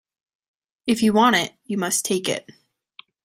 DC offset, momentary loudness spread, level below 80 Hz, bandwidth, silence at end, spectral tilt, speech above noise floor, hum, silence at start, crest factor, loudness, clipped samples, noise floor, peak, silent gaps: under 0.1%; 11 LU; -62 dBFS; 16 kHz; 0.75 s; -3 dB/octave; 30 dB; none; 0.85 s; 18 dB; -21 LUFS; under 0.1%; -51 dBFS; -4 dBFS; none